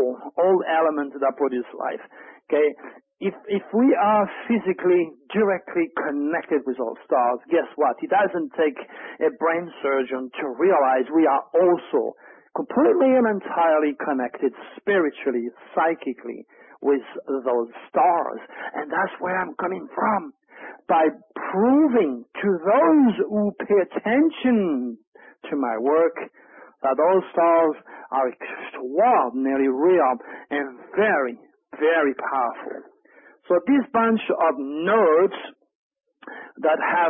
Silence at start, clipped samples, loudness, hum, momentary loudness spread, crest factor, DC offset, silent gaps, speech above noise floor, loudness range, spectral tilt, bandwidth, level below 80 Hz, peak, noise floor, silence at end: 0 s; under 0.1%; -22 LUFS; none; 13 LU; 16 dB; under 0.1%; 25.07-25.12 s, 35.75-35.90 s; 32 dB; 4 LU; -10.5 dB/octave; 3.7 kHz; -70 dBFS; -6 dBFS; -53 dBFS; 0 s